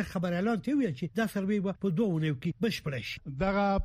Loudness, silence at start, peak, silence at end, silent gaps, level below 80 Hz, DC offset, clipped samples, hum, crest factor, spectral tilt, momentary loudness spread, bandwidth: -31 LUFS; 0 s; -16 dBFS; 0 s; none; -52 dBFS; under 0.1%; under 0.1%; none; 14 dB; -7 dB/octave; 5 LU; 15.5 kHz